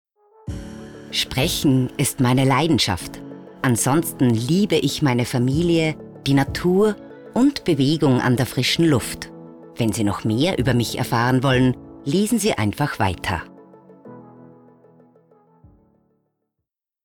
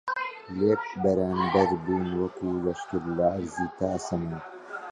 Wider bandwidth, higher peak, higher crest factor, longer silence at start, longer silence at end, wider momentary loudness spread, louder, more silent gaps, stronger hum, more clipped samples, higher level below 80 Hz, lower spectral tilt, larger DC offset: first, 20 kHz vs 10.5 kHz; about the same, -8 dBFS vs -10 dBFS; second, 12 dB vs 18 dB; first, 0.45 s vs 0.05 s; first, 2.6 s vs 0 s; first, 16 LU vs 9 LU; first, -20 LUFS vs -28 LUFS; neither; neither; neither; first, -46 dBFS vs -52 dBFS; second, -5 dB/octave vs -7 dB/octave; neither